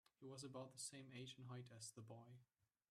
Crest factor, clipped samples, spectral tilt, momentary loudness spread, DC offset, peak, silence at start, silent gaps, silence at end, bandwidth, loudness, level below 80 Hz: 18 dB; under 0.1%; -4 dB/octave; 9 LU; under 0.1%; -40 dBFS; 0.2 s; none; 0.45 s; 14 kHz; -57 LUFS; under -90 dBFS